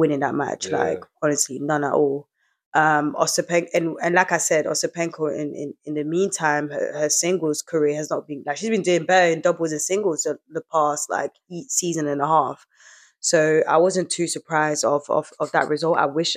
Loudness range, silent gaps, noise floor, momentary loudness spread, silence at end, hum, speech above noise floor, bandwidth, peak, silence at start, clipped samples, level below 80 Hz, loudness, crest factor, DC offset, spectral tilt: 2 LU; 2.66-2.72 s; -51 dBFS; 9 LU; 0 s; none; 30 dB; 16 kHz; -2 dBFS; 0 s; under 0.1%; -80 dBFS; -22 LUFS; 20 dB; under 0.1%; -3.5 dB/octave